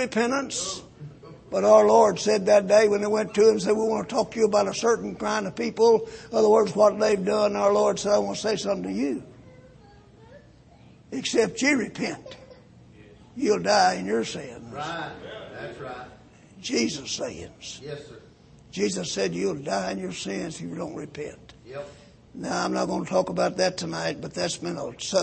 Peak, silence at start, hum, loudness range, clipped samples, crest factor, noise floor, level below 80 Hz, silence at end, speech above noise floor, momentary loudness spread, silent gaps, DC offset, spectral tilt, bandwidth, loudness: -4 dBFS; 0 s; none; 11 LU; under 0.1%; 20 dB; -52 dBFS; -58 dBFS; 0 s; 28 dB; 19 LU; none; under 0.1%; -4 dB/octave; 8.8 kHz; -24 LUFS